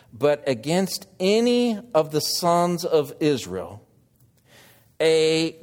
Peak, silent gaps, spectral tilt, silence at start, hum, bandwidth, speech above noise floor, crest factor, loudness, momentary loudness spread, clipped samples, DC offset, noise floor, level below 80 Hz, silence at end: -6 dBFS; none; -4.5 dB/octave; 0.15 s; none; 17 kHz; 37 dB; 18 dB; -22 LUFS; 8 LU; under 0.1%; under 0.1%; -59 dBFS; -64 dBFS; 0.1 s